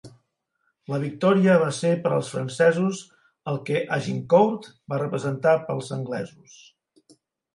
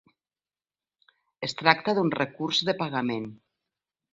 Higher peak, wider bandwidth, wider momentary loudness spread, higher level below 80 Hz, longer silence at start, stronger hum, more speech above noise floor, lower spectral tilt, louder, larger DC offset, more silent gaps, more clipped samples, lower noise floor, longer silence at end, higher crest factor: second, -6 dBFS vs -2 dBFS; first, 11.5 kHz vs 7.8 kHz; about the same, 12 LU vs 12 LU; about the same, -68 dBFS vs -70 dBFS; second, 0.05 s vs 1.4 s; second, none vs 50 Hz at -55 dBFS; second, 51 dB vs over 64 dB; first, -6.5 dB/octave vs -4.5 dB/octave; first, -23 LUFS vs -26 LUFS; neither; neither; neither; second, -74 dBFS vs under -90 dBFS; first, 1.3 s vs 0.8 s; second, 18 dB vs 28 dB